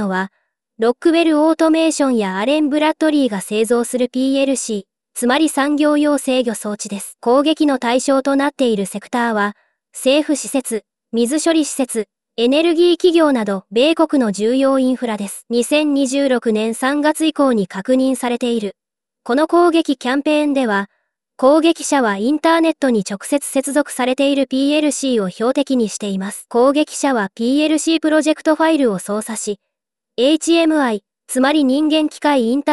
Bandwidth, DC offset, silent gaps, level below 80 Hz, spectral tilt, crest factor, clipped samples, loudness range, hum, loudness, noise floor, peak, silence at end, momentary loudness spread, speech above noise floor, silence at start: 13.5 kHz; 0.1%; none; -66 dBFS; -4 dB/octave; 14 dB; under 0.1%; 2 LU; none; -16 LUFS; -81 dBFS; -2 dBFS; 0 s; 9 LU; 65 dB; 0 s